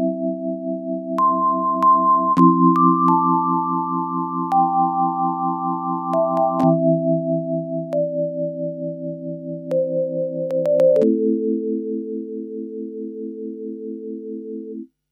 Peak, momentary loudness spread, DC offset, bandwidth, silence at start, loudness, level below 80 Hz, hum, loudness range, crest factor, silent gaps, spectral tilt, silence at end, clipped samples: -2 dBFS; 16 LU; under 0.1%; 6.6 kHz; 0 s; -20 LUFS; -70 dBFS; none; 8 LU; 18 dB; none; -10.5 dB/octave; 0.25 s; under 0.1%